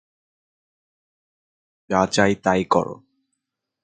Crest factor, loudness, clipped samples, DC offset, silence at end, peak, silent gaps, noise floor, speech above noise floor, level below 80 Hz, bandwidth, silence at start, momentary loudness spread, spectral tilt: 24 dB; -20 LUFS; under 0.1%; under 0.1%; 0.9 s; -2 dBFS; none; -80 dBFS; 60 dB; -54 dBFS; 9.4 kHz; 1.9 s; 5 LU; -5 dB/octave